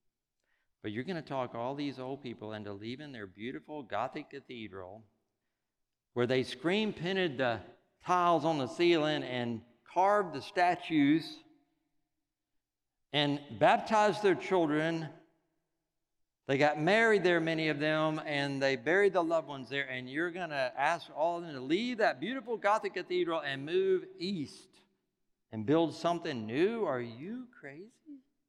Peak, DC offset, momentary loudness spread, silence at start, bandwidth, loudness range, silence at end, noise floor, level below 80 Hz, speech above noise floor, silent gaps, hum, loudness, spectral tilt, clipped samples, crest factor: -12 dBFS; under 0.1%; 16 LU; 0.85 s; 11.5 kHz; 10 LU; 0.3 s; -86 dBFS; -78 dBFS; 54 dB; none; none; -32 LUFS; -5.5 dB/octave; under 0.1%; 22 dB